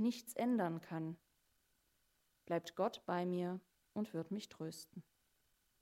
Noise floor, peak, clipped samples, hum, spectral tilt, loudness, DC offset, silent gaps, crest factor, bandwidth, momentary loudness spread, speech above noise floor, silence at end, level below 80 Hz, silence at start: -80 dBFS; -24 dBFS; under 0.1%; none; -6 dB/octave; -42 LUFS; under 0.1%; none; 18 dB; 16 kHz; 13 LU; 39 dB; 0.8 s; -86 dBFS; 0 s